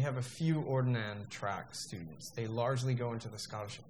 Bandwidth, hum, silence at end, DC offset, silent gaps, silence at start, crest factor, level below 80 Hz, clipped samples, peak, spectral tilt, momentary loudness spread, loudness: 13.5 kHz; none; 0 s; under 0.1%; none; 0 s; 16 dB; -70 dBFS; under 0.1%; -20 dBFS; -6 dB/octave; 10 LU; -37 LUFS